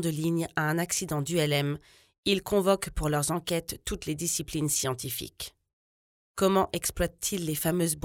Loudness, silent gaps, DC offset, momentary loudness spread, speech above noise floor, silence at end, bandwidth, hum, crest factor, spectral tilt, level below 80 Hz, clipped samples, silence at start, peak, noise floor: -28 LUFS; 2.18-2.23 s, 5.73-6.35 s; under 0.1%; 9 LU; over 61 dB; 0.05 s; 18 kHz; none; 20 dB; -4 dB/octave; -48 dBFS; under 0.1%; 0 s; -10 dBFS; under -90 dBFS